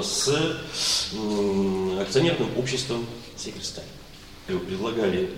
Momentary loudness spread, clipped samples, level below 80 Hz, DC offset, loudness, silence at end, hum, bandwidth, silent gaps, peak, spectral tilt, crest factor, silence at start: 14 LU; under 0.1%; -50 dBFS; under 0.1%; -25 LUFS; 0 s; none; 16.5 kHz; none; -8 dBFS; -4 dB/octave; 18 dB; 0 s